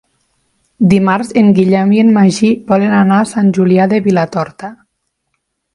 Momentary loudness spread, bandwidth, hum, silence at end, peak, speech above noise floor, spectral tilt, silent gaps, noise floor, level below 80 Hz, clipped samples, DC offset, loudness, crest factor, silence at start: 8 LU; 11.5 kHz; none; 1 s; 0 dBFS; 58 dB; -7 dB/octave; none; -68 dBFS; -52 dBFS; under 0.1%; under 0.1%; -11 LUFS; 12 dB; 0.8 s